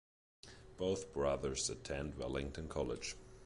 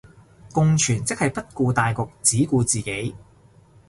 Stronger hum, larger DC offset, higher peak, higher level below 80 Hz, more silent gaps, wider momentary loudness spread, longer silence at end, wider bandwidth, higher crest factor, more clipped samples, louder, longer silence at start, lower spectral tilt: neither; neither; second, -24 dBFS vs -2 dBFS; about the same, -54 dBFS vs -50 dBFS; neither; first, 19 LU vs 9 LU; second, 0 s vs 0.7 s; about the same, 11.5 kHz vs 11.5 kHz; about the same, 18 dB vs 20 dB; neither; second, -41 LUFS vs -21 LUFS; about the same, 0.45 s vs 0.45 s; about the same, -4 dB/octave vs -4.5 dB/octave